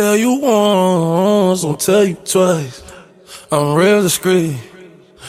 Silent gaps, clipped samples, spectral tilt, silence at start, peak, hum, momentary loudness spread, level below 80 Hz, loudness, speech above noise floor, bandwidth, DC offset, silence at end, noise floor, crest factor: none; under 0.1%; -5 dB/octave; 0 s; -2 dBFS; none; 8 LU; -54 dBFS; -14 LUFS; 27 dB; 16 kHz; under 0.1%; 0 s; -40 dBFS; 14 dB